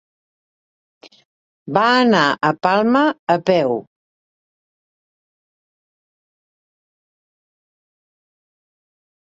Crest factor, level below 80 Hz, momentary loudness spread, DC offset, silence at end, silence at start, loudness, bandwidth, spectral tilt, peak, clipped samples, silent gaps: 22 dB; -66 dBFS; 8 LU; under 0.1%; 5.55 s; 1.65 s; -16 LUFS; 7.8 kHz; -5.5 dB/octave; 0 dBFS; under 0.1%; 3.19-3.27 s